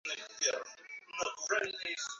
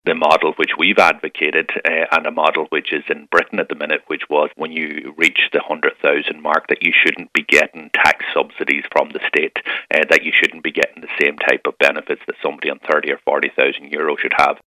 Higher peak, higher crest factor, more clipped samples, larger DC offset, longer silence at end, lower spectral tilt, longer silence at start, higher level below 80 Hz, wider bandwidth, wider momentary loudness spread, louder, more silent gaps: second, -18 dBFS vs 0 dBFS; about the same, 20 dB vs 18 dB; neither; neither; about the same, 0 s vs 0.1 s; second, 2 dB/octave vs -3 dB/octave; about the same, 0.05 s vs 0.05 s; second, -80 dBFS vs -58 dBFS; second, 8 kHz vs 16 kHz; first, 11 LU vs 8 LU; second, -36 LUFS vs -16 LUFS; neither